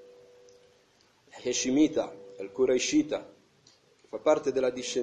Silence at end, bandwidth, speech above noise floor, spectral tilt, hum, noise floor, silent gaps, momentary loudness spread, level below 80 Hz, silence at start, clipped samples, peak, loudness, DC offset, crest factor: 0 s; 10 kHz; 37 dB; -3.5 dB/octave; none; -64 dBFS; none; 14 LU; -66 dBFS; 1.35 s; under 0.1%; -10 dBFS; -28 LUFS; under 0.1%; 20 dB